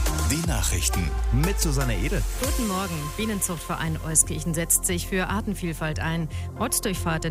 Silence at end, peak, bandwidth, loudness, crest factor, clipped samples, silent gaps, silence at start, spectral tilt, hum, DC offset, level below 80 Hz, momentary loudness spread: 0 s; -4 dBFS; 16 kHz; -25 LUFS; 22 dB; under 0.1%; none; 0 s; -4 dB/octave; none; under 0.1%; -30 dBFS; 8 LU